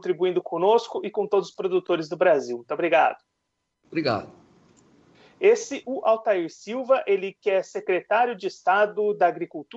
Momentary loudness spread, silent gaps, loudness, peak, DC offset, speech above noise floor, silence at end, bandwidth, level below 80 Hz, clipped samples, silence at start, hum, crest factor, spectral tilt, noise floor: 9 LU; none; -24 LUFS; -8 dBFS; under 0.1%; 55 dB; 0 s; 8 kHz; -74 dBFS; under 0.1%; 0.05 s; none; 16 dB; -5 dB/octave; -78 dBFS